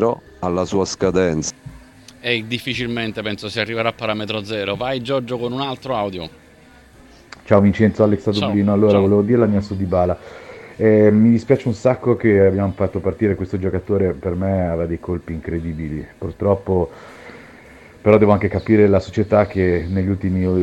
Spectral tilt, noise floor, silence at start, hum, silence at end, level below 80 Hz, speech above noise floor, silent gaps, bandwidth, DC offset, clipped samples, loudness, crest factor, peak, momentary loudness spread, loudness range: -6.5 dB/octave; -47 dBFS; 0 s; none; 0 s; -42 dBFS; 29 dB; none; 11.5 kHz; under 0.1%; under 0.1%; -18 LUFS; 18 dB; 0 dBFS; 12 LU; 7 LU